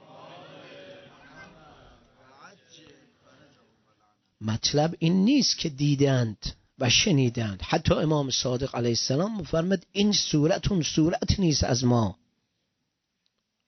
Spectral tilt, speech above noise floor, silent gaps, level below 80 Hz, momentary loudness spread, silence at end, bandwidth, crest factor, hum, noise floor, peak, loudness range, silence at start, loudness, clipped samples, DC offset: -5 dB/octave; 55 dB; none; -46 dBFS; 15 LU; 1.55 s; 6.4 kHz; 18 dB; none; -79 dBFS; -8 dBFS; 4 LU; 0.15 s; -24 LUFS; under 0.1%; under 0.1%